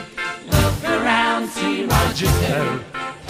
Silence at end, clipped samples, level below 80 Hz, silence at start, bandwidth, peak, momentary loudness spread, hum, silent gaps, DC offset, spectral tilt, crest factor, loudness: 0 s; under 0.1%; -30 dBFS; 0 s; 15.5 kHz; -2 dBFS; 10 LU; none; none; under 0.1%; -4.5 dB/octave; 18 dB; -19 LUFS